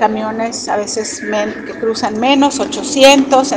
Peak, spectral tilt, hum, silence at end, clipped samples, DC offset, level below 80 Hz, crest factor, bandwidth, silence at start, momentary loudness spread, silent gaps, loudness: 0 dBFS; -2.5 dB/octave; none; 0 s; 0.3%; under 0.1%; -50 dBFS; 14 dB; 16 kHz; 0 s; 12 LU; none; -13 LUFS